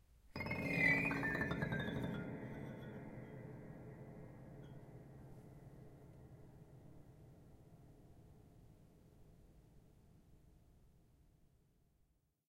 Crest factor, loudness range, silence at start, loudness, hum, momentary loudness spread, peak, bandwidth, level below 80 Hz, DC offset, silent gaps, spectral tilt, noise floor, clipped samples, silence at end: 24 dB; 26 LU; 0.1 s; -41 LUFS; none; 28 LU; -22 dBFS; 16 kHz; -66 dBFS; under 0.1%; none; -6.5 dB/octave; -79 dBFS; under 0.1%; 1 s